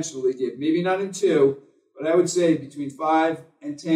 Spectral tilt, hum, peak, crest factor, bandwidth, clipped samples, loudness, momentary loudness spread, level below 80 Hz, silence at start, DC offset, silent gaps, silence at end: -5 dB/octave; none; -8 dBFS; 16 dB; 12 kHz; under 0.1%; -22 LUFS; 14 LU; -80 dBFS; 0 s; under 0.1%; none; 0 s